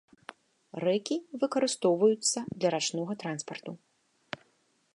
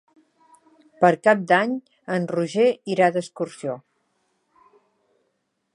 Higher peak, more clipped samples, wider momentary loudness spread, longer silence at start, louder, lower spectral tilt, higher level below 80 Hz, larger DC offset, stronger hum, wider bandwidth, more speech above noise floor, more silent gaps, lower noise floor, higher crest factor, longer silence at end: second, -12 dBFS vs -2 dBFS; neither; first, 20 LU vs 14 LU; second, 0.75 s vs 1 s; second, -29 LUFS vs -22 LUFS; second, -3.5 dB/octave vs -6 dB/octave; about the same, -76 dBFS vs -78 dBFS; neither; neither; about the same, 11.5 kHz vs 11 kHz; second, 41 dB vs 53 dB; neither; about the same, -71 dBFS vs -74 dBFS; about the same, 18 dB vs 22 dB; second, 1.2 s vs 1.95 s